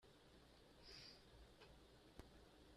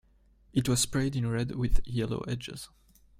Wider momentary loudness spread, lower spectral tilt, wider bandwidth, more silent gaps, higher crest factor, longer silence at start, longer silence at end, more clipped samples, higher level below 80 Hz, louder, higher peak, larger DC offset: second, 9 LU vs 13 LU; about the same, -4 dB/octave vs -5 dB/octave; second, 13.5 kHz vs 16 kHz; neither; first, 28 dB vs 18 dB; second, 0 s vs 0.55 s; second, 0 s vs 0.55 s; neither; second, -72 dBFS vs -36 dBFS; second, -65 LUFS vs -31 LUFS; second, -38 dBFS vs -12 dBFS; neither